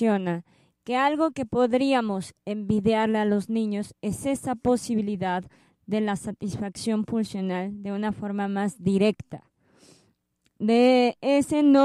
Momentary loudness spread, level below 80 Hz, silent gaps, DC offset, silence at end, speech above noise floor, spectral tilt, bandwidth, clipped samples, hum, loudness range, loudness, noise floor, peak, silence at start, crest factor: 11 LU; -58 dBFS; none; under 0.1%; 0 s; 46 dB; -6 dB/octave; 13 kHz; under 0.1%; none; 4 LU; -25 LUFS; -71 dBFS; -8 dBFS; 0 s; 18 dB